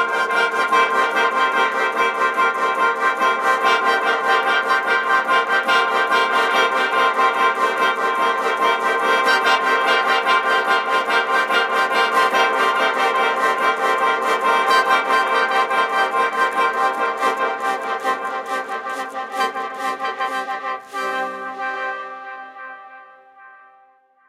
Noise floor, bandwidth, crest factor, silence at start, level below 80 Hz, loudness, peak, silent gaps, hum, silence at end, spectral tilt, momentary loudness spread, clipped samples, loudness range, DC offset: -55 dBFS; 15.5 kHz; 14 dB; 0 s; -72 dBFS; -18 LUFS; -4 dBFS; none; none; 0.8 s; -1 dB/octave; 9 LU; under 0.1%; 8 LU; under 0.1%